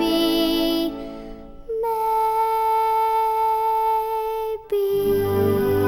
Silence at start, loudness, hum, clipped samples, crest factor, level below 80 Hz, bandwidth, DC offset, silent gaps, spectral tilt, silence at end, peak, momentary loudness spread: 0 s; -21 LUFS; none; under 0.1%; 12 dB; -44 dBFS; 19.5 kHz; under 0.1%; none; -5.5 dB/octave; 0 s; -8 dBFS; 10 LU